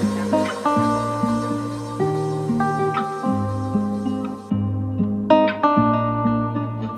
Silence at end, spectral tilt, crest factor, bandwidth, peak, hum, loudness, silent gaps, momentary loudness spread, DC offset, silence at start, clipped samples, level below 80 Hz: 0 s; -7.5 dB/octave; 18 dB; 13 kHz; -2 dBFS; none; -21 LUFS; none; 8 LU; under 0.1%; 0 s; under 0.1%; -50 dBFS